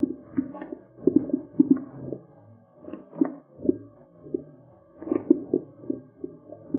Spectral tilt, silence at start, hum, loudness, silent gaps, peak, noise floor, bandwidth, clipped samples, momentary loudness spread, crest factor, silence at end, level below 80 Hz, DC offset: -8.5 dB/octave; 0 s; none; -28 LUFS; none; -4 dBFS; -53 dBFS; 2.9 kHz; under 0.1%; 18 LU; 24 dB; 0 s; -64 dBFS; under 0.1%